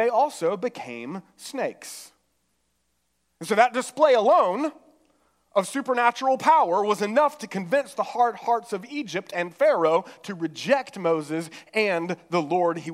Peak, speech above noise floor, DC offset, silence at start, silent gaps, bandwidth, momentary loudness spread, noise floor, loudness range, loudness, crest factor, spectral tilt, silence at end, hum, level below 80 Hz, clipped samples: -4 dBFS; 50 dB; under 0.1%; 0 s; none; 15.5 kHz; 14 LU; -73 dBFS; 6 LU; -24 LUFS; 20 dB; -4.5 dB/octave; 0 s; none; -80 dBFS; under 0.1%